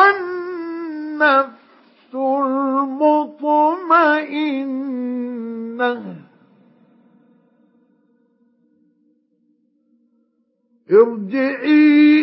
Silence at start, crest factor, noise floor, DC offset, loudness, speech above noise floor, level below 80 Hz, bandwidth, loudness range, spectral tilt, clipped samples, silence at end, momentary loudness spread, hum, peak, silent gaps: 0 s; 18 dB; -65 dBFS; under 0.1%; -17 LUFS; 51 dB; -82 dBFS; 5.8 kHz; 11 LU; -10 dB/octave; under 0.1%; 0 s; 14 LU; none; 0 dBFS; none